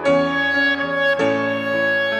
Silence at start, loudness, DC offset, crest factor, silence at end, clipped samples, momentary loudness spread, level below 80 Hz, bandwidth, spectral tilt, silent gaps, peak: 0 s; -18 LUFS; under 0.1%; 12 dB; 0 s; under 0.1%; 3 LU; -60 dBFS; 9.8 kHz; -5 dB/octave; none; -6 dBFS